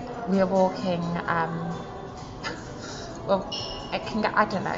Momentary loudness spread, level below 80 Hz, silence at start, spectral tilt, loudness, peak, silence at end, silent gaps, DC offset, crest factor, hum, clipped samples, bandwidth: 13 LU; -50 dBFS; 0 s; -6 dB/octave; -27 LUFS; -8 dBFS; 0 s; none; under 0.1%; 20 dB; none; under 0.1%; 7.8 kHz